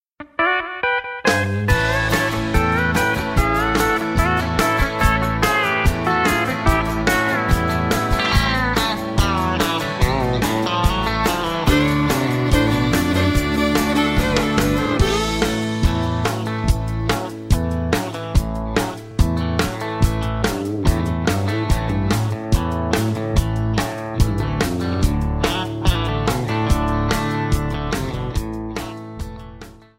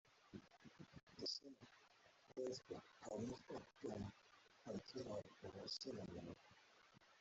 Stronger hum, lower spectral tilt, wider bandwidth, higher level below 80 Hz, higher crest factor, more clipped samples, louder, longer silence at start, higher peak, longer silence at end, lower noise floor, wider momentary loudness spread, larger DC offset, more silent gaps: neither; first, -5.5 dB/octave vs -4 dB/octave; first, 16.5 kHz vs 8 kHz; first, -26 dBFS vs -80 dBFS; about the same, 16 dB vs 18 dB; neither; first, -19 LUFS vs -53 LUFS; first, 0.2 s vs 0.05 s; first, -2 dBFS vs -36 dBFS; first, 0.2 s vs 0 s; second, -39 dBFS vs -72 dBFS; second, 5 LU vs 18 LU; neither; second, none vs 1.03-1.07 s